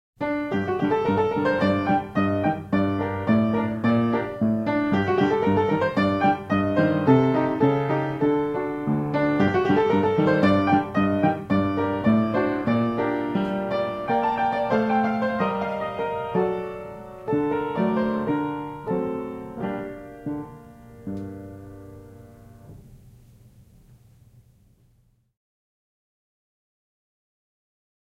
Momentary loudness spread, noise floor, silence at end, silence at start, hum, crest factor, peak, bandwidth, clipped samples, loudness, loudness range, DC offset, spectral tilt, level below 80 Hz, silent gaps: 13 LU; -63 dBFS; 5.15 s; 0.2 s; none; 20 dB; -4 dBFS; 8 kHz; under 0.1%; -23 LUFS; 13 LU; under 0.1%; -8.5 dB/octave; -54 dBFS; none